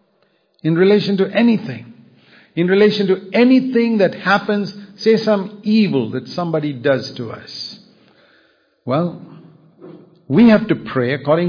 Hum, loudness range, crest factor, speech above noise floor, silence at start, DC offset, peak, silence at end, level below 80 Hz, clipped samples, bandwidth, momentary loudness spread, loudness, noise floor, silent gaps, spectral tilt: none; 8 LU; 14 dB; 45 dB; 0.65 s; under 0.1%; -2 dBFS; 0 s; -60 dBFS; under 0.1%; 5.2 kHz; 15 LU; -16 LUFS; -61 dBFS; none; -7.5 dB/octave